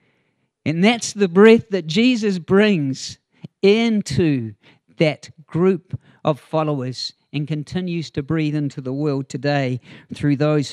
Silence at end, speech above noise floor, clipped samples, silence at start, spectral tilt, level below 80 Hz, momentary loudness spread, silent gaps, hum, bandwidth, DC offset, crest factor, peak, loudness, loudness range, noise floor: 0 s; 49 dB; under 0.1%; 0.65 s; -6 dB/octave; -56 dBFS; 13 LU; none; none; 11.5 kHz; under 0.1%; 20 dB; 0 dBFS; -19 LUFS; 7 LU; -68 dBFS